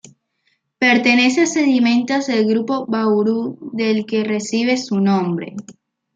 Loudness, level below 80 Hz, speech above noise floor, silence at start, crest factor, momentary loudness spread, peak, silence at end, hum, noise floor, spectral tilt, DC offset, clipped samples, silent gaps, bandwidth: -17 LUFS; -66 dBFS; 50 dB; 0.8 s; 16 dB; 10 LU; -2 dBFS; 0.45 s; none; -67 dBFS; -4.5 dB/octave; under 0.1%; under 0.1%; none; 9 kHz